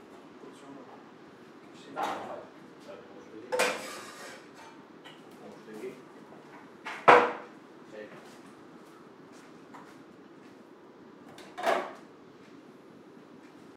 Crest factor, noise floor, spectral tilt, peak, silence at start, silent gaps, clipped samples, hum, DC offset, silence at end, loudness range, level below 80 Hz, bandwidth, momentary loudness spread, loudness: 32 dB; -53 dBFS; -3 dB/octave; -2 dBFS; 0.1 s; none; under 0.1%; none; under 0.1%; 0.4 s; 21 LU; -86 dBFS; 16 kHz; 23 LU; -29 LUFS